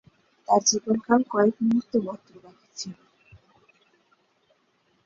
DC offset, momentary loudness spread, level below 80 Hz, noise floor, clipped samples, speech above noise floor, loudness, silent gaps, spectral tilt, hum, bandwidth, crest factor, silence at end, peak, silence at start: under 0.1%; 19 LU; -68 dBFS; -68 dBFS; under 0.1%; 44 dB; -23 LUFS; none; -3.5 dB/octave; none; 7.6 kHz; 20 dB; 2.1 s; -6 dBFS; 0.5 s